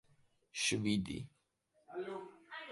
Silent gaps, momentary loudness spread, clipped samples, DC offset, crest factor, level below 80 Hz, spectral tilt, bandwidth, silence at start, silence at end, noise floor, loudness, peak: none; 16 LU; under 0.1%; under 0.1%; 20 dB; -66 dBFS; -3.5 dB/octave; 11.5 kHz; 0.55 s; 0 s; -77 dBFS; -39 LUFS; -22 dBFS